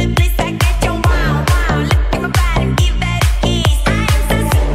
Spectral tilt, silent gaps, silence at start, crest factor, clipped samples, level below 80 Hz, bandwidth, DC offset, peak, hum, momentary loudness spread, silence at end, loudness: -5 dB/octave; none; 0 s; 12 dB; under 0.1%; -16 dBFS; 16 kHz; under 0.1%; 0 dBFS; none; 1 LU; 0 s; -15 LUFS